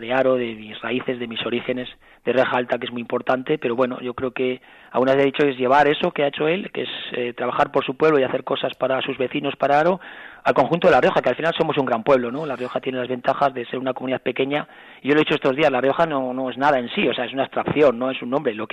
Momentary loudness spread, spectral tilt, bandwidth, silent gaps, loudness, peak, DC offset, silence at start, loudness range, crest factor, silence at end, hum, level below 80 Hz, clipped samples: 9 LU; -6.5 dB/octave; 8.6 kHz; none; -21 LUFS; -6 dBFS; under 0.1%; 0 s; 4 LU; 14 dB; 0.05 s; none; -58 dBFS; under 0.1%